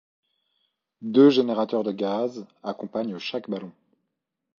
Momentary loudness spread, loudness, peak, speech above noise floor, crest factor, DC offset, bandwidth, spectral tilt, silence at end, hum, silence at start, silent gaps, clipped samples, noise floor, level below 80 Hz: 18 LU; -24 LUFS; -6 dBFS; 58 dB; 20 dB; under 0.1%; 7 kHz; -7 dB/octave; 0.9 s; none; 1 s; none; under 0.1%; -81 dBFS; -76 dBFS